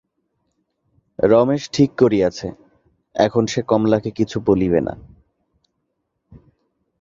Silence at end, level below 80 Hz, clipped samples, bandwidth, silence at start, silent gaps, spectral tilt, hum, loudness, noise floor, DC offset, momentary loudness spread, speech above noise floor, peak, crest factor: 2 s; -48 dBFS; under 0.1%; 7.6 kHz; 1.2 s; none; -6.5 dB/octave; none; -18 LUFS; -74 dBFS; under 0.1%; 14 LU; 57 dB; -2 dBFS; 18 dB